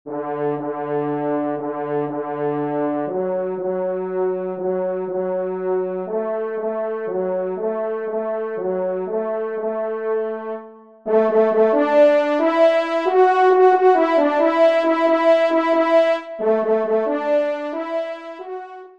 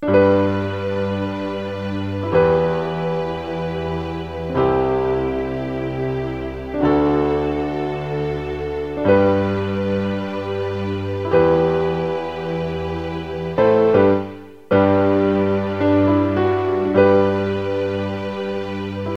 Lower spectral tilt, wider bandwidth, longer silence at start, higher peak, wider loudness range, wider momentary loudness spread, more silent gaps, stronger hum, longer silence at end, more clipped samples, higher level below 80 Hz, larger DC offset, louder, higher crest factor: second, -7 dB/octave vs -8.5 dB/octave; about the same, 7.8 kHz vs 7.4 kHz; about the same, 0.05 s vs 0 s; about the same, -4 dBFS vs -2 dBFS; first, 8 LU vs 5 LU; about the same, 10 LU vs 10 LU; neither; neither; about the same, 0.1 s vs 0.05 s; neither; second, -72 dBFS vs -42 dBFS; second, 0.1% vs 0.5%; about the same, -19 LUFS vs -20 LUFS; about the same, 16 dB vs 18 dB